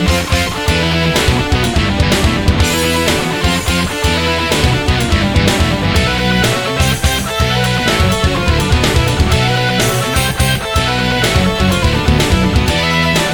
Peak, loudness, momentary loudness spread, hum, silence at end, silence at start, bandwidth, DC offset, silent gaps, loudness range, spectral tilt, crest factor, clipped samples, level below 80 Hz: 0 dBFS; -13 LUFS; 2 LU; none; 0 s; 0 s; 19.5 kHz; 0.2%; none; 0 LU; -4.5 dB/octave; 12 dB; under 0.1%; -20 dBFS